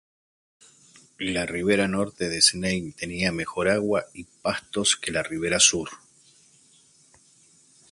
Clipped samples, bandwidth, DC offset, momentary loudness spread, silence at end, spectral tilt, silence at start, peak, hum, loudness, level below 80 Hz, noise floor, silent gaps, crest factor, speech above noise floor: under 0.1%; 11.5 kHz; under 0.1%; 13 LU; 1.95 s; -2.5 dB/octave; 1.2 s; -4 dBFS; none; -23 LUFS; -54 dBFS; -58 dBFS; none; 24 dB; 33 dB